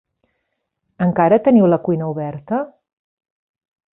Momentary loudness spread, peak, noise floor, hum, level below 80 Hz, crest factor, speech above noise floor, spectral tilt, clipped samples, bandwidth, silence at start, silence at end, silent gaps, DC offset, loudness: 12 LU; -2 dBFS; -74 dBFS; none; -60 dBFS; 18 dB; 58 dB; -13.5 dB/octave; under 0.1%; 3.7 kHz; 1 s; 1.25 s; none; under 0.1%; -17 LUFS